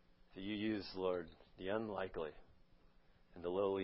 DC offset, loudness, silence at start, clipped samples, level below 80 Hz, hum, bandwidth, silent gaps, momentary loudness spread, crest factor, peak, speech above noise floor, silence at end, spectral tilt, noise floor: under 0.1%; -43 LUFS; 0.3 s; under 0.1%; -66 dBFS; none; 5.6 kHz; none; 12 LU; 18 dB; -26 dBFS; 26 dB; 0 s; -4.5 dB/octave; -67 dBFS